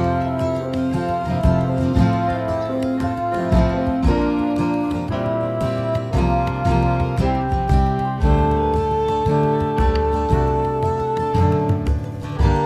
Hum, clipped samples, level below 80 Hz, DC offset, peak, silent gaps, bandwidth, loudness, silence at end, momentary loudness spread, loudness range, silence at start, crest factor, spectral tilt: none; under 0.1%; -26 dBFS; under 0.1%; -2 dBFS; none; 11 kHz; -20 LUFS; 0 s; 4 LU; 2 LU; 0 s; 16 dB; -8.5 dB/octave